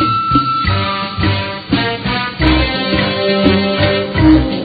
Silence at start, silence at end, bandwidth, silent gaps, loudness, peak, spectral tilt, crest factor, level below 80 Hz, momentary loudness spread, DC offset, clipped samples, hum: 0 s; 0 s; 5 kHz; none; -14 LUFS; 0 dBFS; -9 dB/octave; 14 dB; -26 dBFS; 6 LU; under 0.1%; under 0.1%; none